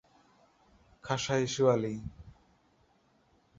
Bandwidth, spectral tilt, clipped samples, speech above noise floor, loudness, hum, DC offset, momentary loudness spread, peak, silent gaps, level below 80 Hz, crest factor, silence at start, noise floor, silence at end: 7.8 kHz; -5 dB/octave; under 0.1%; 39 dB; -31 LUFS; none; under 0.1%; 18 LU; -12 dBFS; none; -60 dBFS; 22 dB; 1.05 s; -68 dBFS; 1.3 s